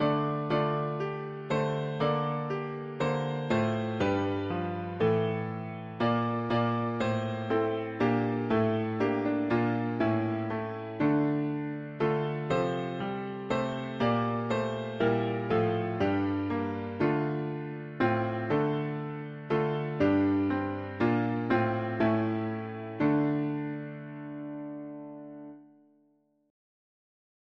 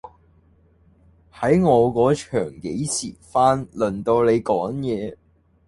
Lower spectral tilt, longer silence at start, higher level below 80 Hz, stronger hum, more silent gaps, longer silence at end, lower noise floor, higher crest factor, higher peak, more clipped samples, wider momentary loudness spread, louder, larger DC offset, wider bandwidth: first, -8 dB/octave vs -6 dB/octave; about the same, 0 s vs 0.05 s; second, -62 dBFS vs -50 dBFS; neither; neither; first, 1.85 s vs 0.55 s; first, -69 dBFS vs -56 dBFS; about the same, 16 dB vs 18 dB; second, -14 dBFS vs -4 dBFS; neither; about the same, 10 LU vs 10 LU; second, -30 LUFS vs -21 LUFS; neither; second, 7.4 kHz vs 11.5 kHz